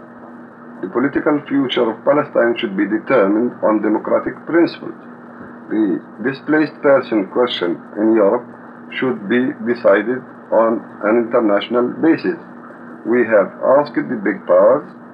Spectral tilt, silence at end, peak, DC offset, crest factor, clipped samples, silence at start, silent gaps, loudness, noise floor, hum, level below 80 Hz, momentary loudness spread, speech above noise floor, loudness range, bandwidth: -8 dB/octave; 0 s; -2 dBFS; under 0.1%; 14 dB; under 0.1%; 0 s; none; -17 LUFS; -37 dBFS; none; -64 dBFS; 19 LU; 21 dB; 2 LU; 5.4 kHz